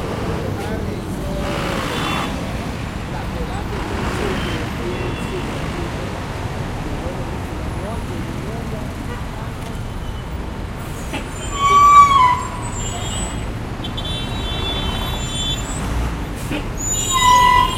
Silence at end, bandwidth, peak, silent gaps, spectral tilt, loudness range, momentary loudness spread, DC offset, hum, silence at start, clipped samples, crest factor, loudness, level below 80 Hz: 0 s; 16.5 kHz; 0 dBFS; none; -4 dB/octave; 11 LU; 15 LU; under 0.1%; none; 0 s; under 0.1%; 20 dB; -20 LUFS; -30 dBFS